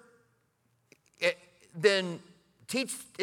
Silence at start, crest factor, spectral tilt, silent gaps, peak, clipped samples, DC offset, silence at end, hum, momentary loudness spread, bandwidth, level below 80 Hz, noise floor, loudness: 1.2 s; 26 dB; -3 dB/octave; none; -8 dBFS; under 0.1%; under 0.1%; 0 s; none; 18 LU; 17.5 kHz; -82 dBFS; -73 dBFS; -30 LUFS